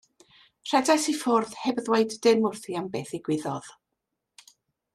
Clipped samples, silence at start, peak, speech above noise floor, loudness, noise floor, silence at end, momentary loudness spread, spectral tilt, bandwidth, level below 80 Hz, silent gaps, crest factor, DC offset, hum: under 0.1%; 0.65 s; -6 dBFS; 57 dB; -26 LUFS; -83 dBFS; 1.25 s; 11 LU; -4 dB/octave; 14 kHz; -72 dBFS; none; 20 dB; under 0.1%; none